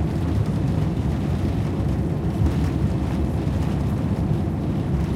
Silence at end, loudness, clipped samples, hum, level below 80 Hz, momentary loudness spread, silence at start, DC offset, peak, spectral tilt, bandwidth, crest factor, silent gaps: 0 s; -23 LUFS; under 0.1%; none; -30 dBFS; 1 LU; 0 s; under 0.1%; -8 dBFS; -8.5 dB/octave; 14 kHz; 14 dB; none